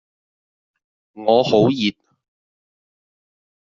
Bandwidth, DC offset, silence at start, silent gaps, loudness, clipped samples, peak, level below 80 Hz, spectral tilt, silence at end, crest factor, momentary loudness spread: 7.4 kHz; under 0.1%; 1.15 s; none; -17 LUFS; under 0.1%; -2 dBFS; -64 dBFS; -4.5 dB/octave; 1.7 s; 20 dB; 9 LU